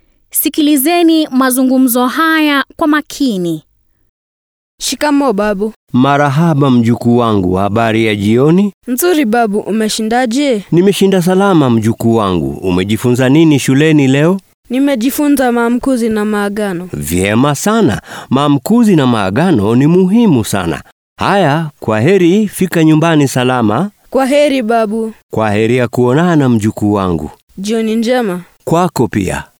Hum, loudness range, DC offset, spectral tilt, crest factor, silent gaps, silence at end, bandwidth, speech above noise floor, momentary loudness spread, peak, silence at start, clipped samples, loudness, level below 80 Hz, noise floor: none; 3 LU; under 0.1%; -6 dB/octave; 12 dB; 4.09-4.78 s, 5.76-5.87 s, 8.74-8.81 s, 14.54-14.63 s, 20.92-21.16 s, 25.23-25.29 s, 27.42-27.48 s; 0.15 s; over 20 kHz; over 79 dB; 7 LU; 0 dBFS; 0.35 s; under 0.1%; -11 LUFS; -44 dBFS; under -90 dBFS